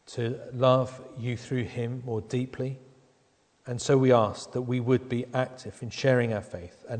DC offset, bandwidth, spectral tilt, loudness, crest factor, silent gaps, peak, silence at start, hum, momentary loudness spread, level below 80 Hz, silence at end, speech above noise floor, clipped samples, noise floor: under 0.1%; 9.4 kHz; -6.5 dB/octave; -28 LUFS; 20 dB; none; -8 dBFS; 0.1 s; none; 14 LU; -62 dBFS; 0 s; 39 dB; under 0.1%; -66 dBFS